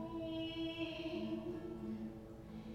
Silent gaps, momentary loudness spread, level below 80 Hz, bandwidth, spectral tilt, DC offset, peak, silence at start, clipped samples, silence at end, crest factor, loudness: none; 9 LU; -62 dBFS; 12.5 kHz; -6.5 dB/octave; under 0.1%; -30 dBFS; 0 s; under 0.1%; 0 s; 14 dB; -45 LUFS